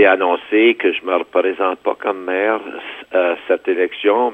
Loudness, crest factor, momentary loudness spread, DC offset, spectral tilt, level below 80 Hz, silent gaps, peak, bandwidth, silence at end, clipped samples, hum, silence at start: -17 LUFS; 14 dB; 7 LU; under 0.1%; -5.5 dB/octave; -66 dBFS; none; -2 dBFS; 3.9 kHz; 0 s; under 0.1%; none; 0 s